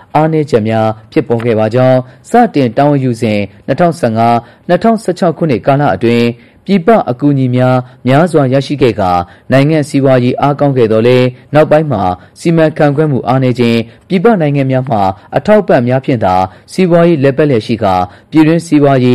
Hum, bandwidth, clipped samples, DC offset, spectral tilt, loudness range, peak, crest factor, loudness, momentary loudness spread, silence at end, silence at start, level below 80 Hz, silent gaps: none; 12.5 kHz; under 0.1%; 0.5%; -7.5 dB/octave; 1 LU; 0 dBFS; 10 dB; -10 LUFS; 5 LU; 0 s; 0.15 s; -44 dBFS; none